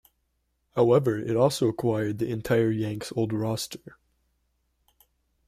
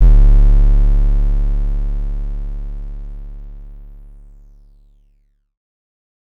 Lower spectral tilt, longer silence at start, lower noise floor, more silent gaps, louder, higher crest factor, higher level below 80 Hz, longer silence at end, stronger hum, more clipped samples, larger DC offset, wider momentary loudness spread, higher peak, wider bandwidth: second, -6.5 dB/octave vs -9.5 dB/octave; first, 0.75 s vs 0 s; first, -74 dBFS vs -57 dBFS; neither; second, -26 LUFS vs -18 LUFS; first, 20 dB vs 10 dB; second, -60 dBFS vs -14 dBFS; second, 1.6 s vs 2.4 s; neither; neither; neither; second, 10 LU vs 23 LU; second, -8 dBFS vs -4 dBFS; first, 15.5 kHz vs 1.7 kHz